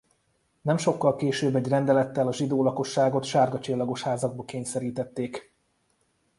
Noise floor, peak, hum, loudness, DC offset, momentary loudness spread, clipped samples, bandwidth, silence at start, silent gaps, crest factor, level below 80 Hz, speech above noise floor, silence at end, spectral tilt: -71 dBFS; -8 dBFS; none; -26 LUFS; under 0.1%; 9 LU; under 0.1%; 11.5 kHz; 0.65 s; none; 18 dB; -66 dBFS; 45 dB; 0.95 s; -6 dB/octave